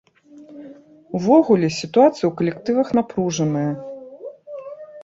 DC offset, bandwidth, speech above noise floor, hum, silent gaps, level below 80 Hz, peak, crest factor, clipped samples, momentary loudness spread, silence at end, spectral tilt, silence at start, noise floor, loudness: under 0.1%; 7.8 kHz; 28 dB; none; none; -60 dBFS; -2 dBFS; 18 dB; under 0.1%; 22 LU; 0 s; -6.5 dB/octave; 0.35 s; -45 dBFS; -19 LUFS